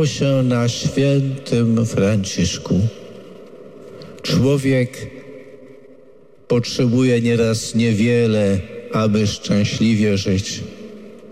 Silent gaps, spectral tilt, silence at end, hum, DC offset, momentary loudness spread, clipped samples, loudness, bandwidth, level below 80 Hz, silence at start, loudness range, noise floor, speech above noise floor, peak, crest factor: none; -6 dB/octave; 0 s; none; 0.4%; 21 LU; under 0.1%; -18 LUFS; 14.5 kHz; -48 dBFS; 0 s; 5 LU; -48 dBFS; 31 dB; -8 dBFS; 10 dB